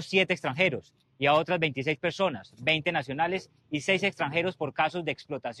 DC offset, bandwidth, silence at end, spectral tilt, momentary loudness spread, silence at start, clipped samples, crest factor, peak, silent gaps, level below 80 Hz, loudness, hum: under 0.1%; 12 kHz; 0 s; -5 dB/octave; 9 LU; 0 s; under 0.1%; 18 dB; -10 dBFS; none; -66 dBFS; -28 LUFS; none